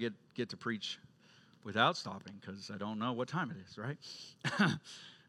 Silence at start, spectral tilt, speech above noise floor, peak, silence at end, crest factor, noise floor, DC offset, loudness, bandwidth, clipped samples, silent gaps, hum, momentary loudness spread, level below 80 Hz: 0 s; -5 dB/octave; 26 dB; -14 dBFS; 0.1 s; 26 dB; -64 dBFS; under 0.1%; -38 LUFS; 12 kHz; under 0.1%; none; none; 16 LU; -84 dBFS